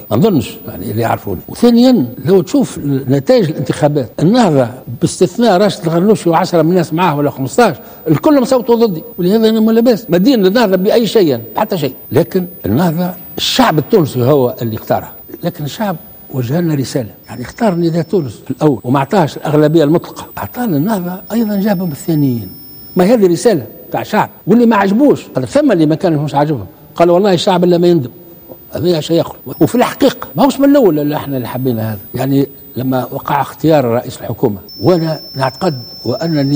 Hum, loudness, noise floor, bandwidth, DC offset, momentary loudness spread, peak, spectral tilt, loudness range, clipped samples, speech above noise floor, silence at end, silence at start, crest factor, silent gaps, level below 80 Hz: none; -13 LUFS; -35 dBFS; 16.5 kHz; under 0.1%; 11 LU; 0 dBFS; -6.5 dB/octave; 4 LU; under 0.1%; 23 dB; 0 s; 0 s; 12 dB; none; -48 dBFS